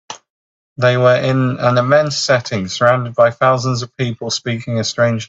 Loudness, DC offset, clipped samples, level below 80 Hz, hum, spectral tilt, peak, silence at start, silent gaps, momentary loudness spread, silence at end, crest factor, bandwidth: -15 LUFS; under 0.1%; under 0.1%; -54 dBFS; none; -5 dB/octave; 0 dBFS; 0.1 s; 0.30-0.76 s; 9 LU; 0.05 s; 16 dB; 8 kHz